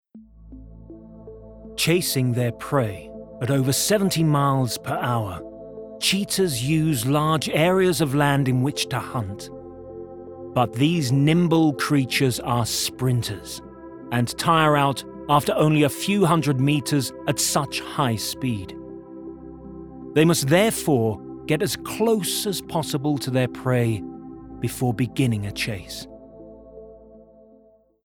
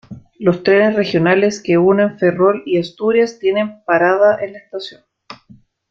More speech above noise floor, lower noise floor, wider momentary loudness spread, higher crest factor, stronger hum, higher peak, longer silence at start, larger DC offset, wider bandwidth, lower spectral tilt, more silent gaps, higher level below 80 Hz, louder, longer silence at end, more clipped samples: about the same, 34 dB vs 33 dB; first, -56 dBFS vs -47 dBFS; first, 20 LU vs 11 LU; about the same, 18 dB vs 14 dB; neither; about the same, -4 dBFS vs -2 dBFS; about the same, 0.15 s vs 0.1 s; neither; first, over 20 kHz vs 7.6 kHz; second, -5 dB/octave vs -6.5 dB/octave; neither; first, -52 dBFS vs -58 dBFS; second, -22 LUFS vs -15 LUFS; first, 0.9 s vs 0.55 s; neither